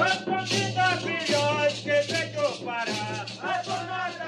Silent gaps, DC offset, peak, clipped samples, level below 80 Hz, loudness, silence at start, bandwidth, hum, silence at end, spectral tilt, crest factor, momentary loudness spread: none; under 0.1%; -10 dBFS; under 0.1%; -68 dBFS; -26 LUFS; 0 s; 13 kHz; none; 0 s; -3.5 dB/octave; 16 dB; 7 LU